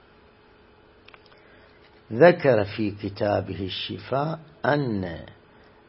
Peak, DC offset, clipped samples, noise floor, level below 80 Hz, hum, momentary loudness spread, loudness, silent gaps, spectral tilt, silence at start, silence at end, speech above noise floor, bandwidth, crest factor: -2 dBFS; under 0.1%; under 0.1%; -55 dBFS; -58 dBFS; none; 14 LU; -24 LUFS; none; -10.5 dB/octave; 2.1 s; 0.55 s; 31 dB; 5.8 kHz; 24 dB